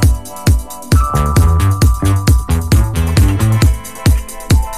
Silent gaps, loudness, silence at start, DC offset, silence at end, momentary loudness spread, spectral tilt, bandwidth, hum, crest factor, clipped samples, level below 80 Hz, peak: none; -13 LUFS; 0 s; 2%; 0 s; 4 LU; -6 dB/octave; 15.5 kHz; none; 10 dB; under 0.1%; -16 dBFS; -2 dBFS